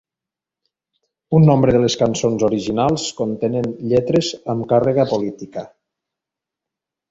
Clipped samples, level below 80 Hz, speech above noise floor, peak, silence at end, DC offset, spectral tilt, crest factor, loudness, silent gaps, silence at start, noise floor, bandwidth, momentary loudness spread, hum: under 0.1%; -50 dBFS; 70 dB; -2 dBFS; 1.45 s; under 0.1%; -6.5 dB/octave; 18 dB; -18 LUFS; none; 1.3 s; -87 dBFS; 8 kHz; 10 LU; none